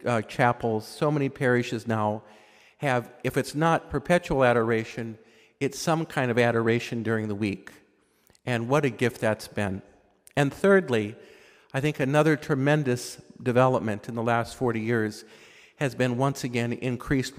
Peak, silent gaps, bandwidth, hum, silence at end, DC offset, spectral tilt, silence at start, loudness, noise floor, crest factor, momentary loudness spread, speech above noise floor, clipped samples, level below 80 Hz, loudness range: -6 dBFS; none; 16 kHz; none; 0.05 s; under 0.1%; -6 dB/octave; 0 s; -26 LUFS; -63 dBFS; 20 dB; 10 LU; 38 dB; under 0.1%; -54 dBFS; 3 LU